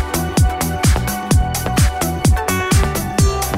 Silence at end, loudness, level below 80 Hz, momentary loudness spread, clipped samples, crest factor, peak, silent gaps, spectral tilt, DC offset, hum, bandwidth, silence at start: 0 s; -17 LUFS; -20 dBFS; 2 LU; under 0.1%; 14 dB; -2 dBFS; none; -5 dB/octave; under 0.1%; none; 16.5 kHz; 0 s